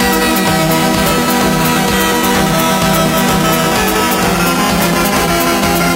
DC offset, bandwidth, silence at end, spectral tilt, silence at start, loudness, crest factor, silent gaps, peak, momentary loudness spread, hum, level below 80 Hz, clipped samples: under 0.1%; 16.5 kHz; 0 s; -4 dB/octave; 0 s; -11 LUFS; 12 dB; none; 0 dBFS; 1 LU; none; -30 dBFS; under 0.1%